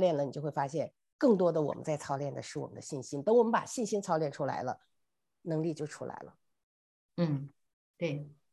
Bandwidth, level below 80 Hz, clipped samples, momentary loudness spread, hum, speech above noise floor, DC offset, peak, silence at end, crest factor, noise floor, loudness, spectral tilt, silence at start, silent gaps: 12 kHz; -76 dBFS; under 0.1%; 15 LU; none; 54 dB; under 0.1%; -14 dBFS; 0.2 s; 18 dB; -86 dBFS; -33 LUFS; -6.5 dB/octave; 0 s; 1.13-1.19 s, 6.63-7.09 s, 7.73-7.94 s